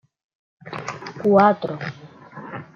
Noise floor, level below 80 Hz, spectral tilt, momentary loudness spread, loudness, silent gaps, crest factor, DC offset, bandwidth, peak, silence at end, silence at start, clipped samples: -40 dBFS; -68 dBFS; -7 dB/octave; 21 LU; -20 LUFS; none; 20 dB; under 0.1%; 7.4 kHz; -4 dBFS; 0.15 s; 0.65 s; under 0.1%